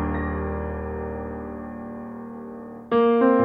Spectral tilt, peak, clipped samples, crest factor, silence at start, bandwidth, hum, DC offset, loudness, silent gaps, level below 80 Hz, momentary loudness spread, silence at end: -10 dB/octave; -6 dBFS; under 0.1%; 18 dB; 0 s; 4.6 kHz; none; under 0.1%; -26 LUFS; none; -38 dBFS; 18 LU; 0 s